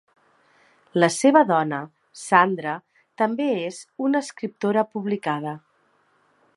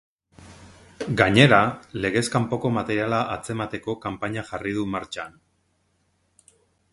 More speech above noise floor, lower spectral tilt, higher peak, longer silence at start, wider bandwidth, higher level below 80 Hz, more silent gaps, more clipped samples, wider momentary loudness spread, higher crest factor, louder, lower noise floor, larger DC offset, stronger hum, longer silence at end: second, 42 dB vs 46 dB; about the same, -5 dB/octave vs -5.5 dB/octave; about the same, -2 dBFS vs 0 dBFS; first, 0.95 s vs 0.4 s; about the same, 11.5 kHz vs 11.5 kHz; second, -78 dBFS vs -52 dBFS; neither; neither; about the same, 16 LU vs 14 LU; about the same, 22 dB vs 24 dB; about the same, -22 LUFS vs -23 LUFS; second, -64 dBFS vs -68 dBFS; neither; neither; second, 1 s vs 1.65 s